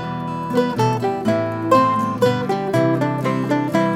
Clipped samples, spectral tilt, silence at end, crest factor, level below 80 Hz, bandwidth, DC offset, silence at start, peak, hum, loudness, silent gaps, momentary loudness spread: under 0.1%; -7 dB/octave; 0 s; 16 dB; -56 dBFS; 16.5 kHz; under 0.1%; 0 s; -2 dBFS; none; -19 LUFS; none; 5 LU